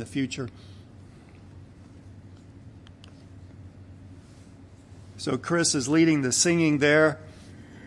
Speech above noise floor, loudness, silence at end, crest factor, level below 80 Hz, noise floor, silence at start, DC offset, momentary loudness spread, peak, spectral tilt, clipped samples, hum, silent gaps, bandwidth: 25 dB; -23 LUFS; 0 s; 20 dB; -60 dBFS; -49 dBFS; 0 s; under 0.1%; 27 LU; -8 dBFS; -4 dB/octave; under 0.1%; none; none; 12 kHz